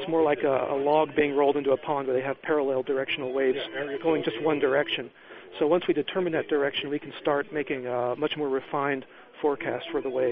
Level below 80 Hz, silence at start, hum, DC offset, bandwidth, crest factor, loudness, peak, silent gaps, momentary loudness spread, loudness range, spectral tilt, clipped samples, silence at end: -68 dBFS; 0 s; none; under 0.1%; 5 kHz; 18 dB; -27 LUFS; -10 dBFS; none; 7 LU; 3 LU; -3 dB/octave; under 0.1%; 0 s